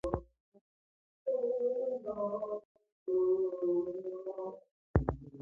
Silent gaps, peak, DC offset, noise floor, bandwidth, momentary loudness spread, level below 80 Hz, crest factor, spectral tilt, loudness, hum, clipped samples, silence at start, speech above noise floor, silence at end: 0.40-0.52 s, 0.61-1.26 s, 2.65-2.75 s, 2.92-3.06 s, 4.71-4.94 s; -12 dBFS; under 0.1%; under -90 dBFS; 4 kHz; 12 LU; -50 dBFS; 24 dB; -10.5 dB/octave; -36 LUFS; none; under 0.1%; 0.05 s; over 57 dB; 0 s